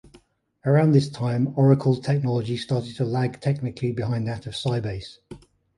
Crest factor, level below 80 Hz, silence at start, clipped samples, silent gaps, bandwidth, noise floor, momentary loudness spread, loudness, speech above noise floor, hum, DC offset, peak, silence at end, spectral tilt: 18 dB; -54 dBFS; 0.65 s; under 0.1%; none; 11 kHz; -56 dBFS; 10 LU; -23 LUFS; 34 dB; none; under 0.1%; -6 dBFS; 0.4 s; -8 dB/octave